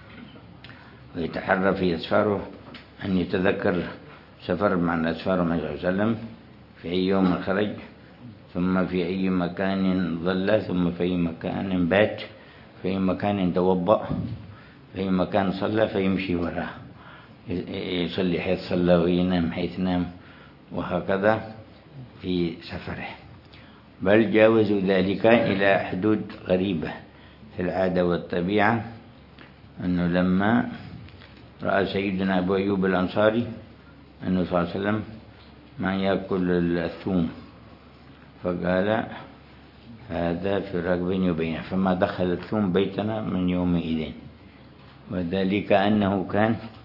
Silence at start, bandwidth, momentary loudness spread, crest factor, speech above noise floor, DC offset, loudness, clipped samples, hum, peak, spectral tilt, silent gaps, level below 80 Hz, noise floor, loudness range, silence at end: 0 s; 5.8 kHz; 18 LU; 22 dB; 25 dB; under 0.1%; -25 LUFS; under 0.1%; none; -2 dBFS; -9.5 dB/octave; none; -56 dBFS; -48 dBFS; 5 LU; 0 s